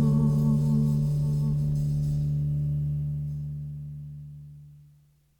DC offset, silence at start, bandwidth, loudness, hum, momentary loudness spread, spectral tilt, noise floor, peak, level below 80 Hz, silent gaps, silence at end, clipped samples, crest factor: under 0.1%; 0 s; 8.8 kHz; -27 LUFS; none; 18 LU; -10 dB/octave; -60 dBFS; -14 dBFS; -42 dBFS; none; 0.6 s; under 0.1%; 12 dB